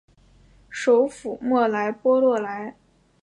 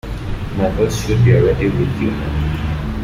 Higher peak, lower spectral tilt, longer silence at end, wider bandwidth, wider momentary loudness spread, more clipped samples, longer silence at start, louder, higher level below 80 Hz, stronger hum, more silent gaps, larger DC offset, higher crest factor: second, -8 dBFS vs -2 dBFS; second, -5 dB/octave vs -7 dB/octave; first, 0.5 s vs 0 s; second, 10.5 kHz vs 15.5 kHz; first, 14 LU vs 11 LU; neither; first, 0.7 s vs 0.05 s; second, -22 LUFS vs -17 LUFS; second, -62 dBFS vs -26 dBFS; neither; neither; neither; about the same, 16 dB vs 14 dB